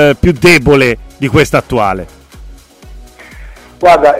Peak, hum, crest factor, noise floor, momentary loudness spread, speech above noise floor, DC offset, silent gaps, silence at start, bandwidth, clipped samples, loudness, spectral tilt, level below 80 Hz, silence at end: 0 dBFS; none; 10 dB; -33 dBFS; 10 LU; 25 dB; under 0.1%; none; 0 s; 16.5 kHz; 0.4%; -9 LUFS; -5.5 dB/octave; -28 dBFS; 0 s